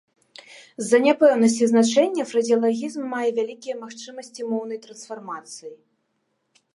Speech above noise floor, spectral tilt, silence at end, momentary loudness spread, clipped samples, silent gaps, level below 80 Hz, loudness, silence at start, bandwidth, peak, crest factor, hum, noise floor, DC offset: 51 dB; -4 dB/octave; 1 s; 20 LU; under 0.1%; none; -78 dBFS; -21 LUFS; 0.5 s; 11.5 kHz; -4 dBFS; 18 dB; none; -73 dBFS; under 0.1%